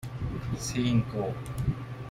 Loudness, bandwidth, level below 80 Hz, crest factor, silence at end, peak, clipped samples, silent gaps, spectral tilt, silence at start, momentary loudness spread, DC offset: -31 LUFS; 15.5 kHz; -44 dBFS; 18 dB; 0 s; -14 dBFS; under 0.1%; none; -6 dB/octave; 0 s; 8 LU; under 0.1%